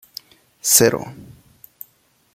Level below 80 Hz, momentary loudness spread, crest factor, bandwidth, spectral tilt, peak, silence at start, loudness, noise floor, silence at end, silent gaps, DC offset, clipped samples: -56 dBFS; 26 LU; 22 dB; 16.5 kHz; -2.5 dB/octave; 0 dBFS; 0.65 s; -15 LUFS; -60 dBFS; 1.1 s; none; under 0.1%; under 0.1%